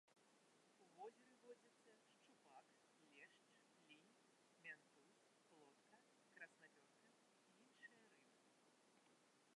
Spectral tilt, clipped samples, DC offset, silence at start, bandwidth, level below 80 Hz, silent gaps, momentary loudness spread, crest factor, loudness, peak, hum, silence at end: -2.5 dB/octave; under 0.1%; under 0.1%; 0.05 s; 11 kHz; under -90 dBFS; none; 7 LU; 24 dB; -65 LUFS; -46 dBFS; none; 0 s